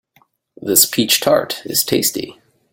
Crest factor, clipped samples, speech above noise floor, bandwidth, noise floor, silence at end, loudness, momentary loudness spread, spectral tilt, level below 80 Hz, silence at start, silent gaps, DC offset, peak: 18 dB; under 0.1%; 42 dB; 17 kHz; -58 dBFS; 0.4 s; -14 LUFS; 16 LU; -2 dB/octave; -56 dBFS; 0.6 s; none; under 0.1%; 0 dBFS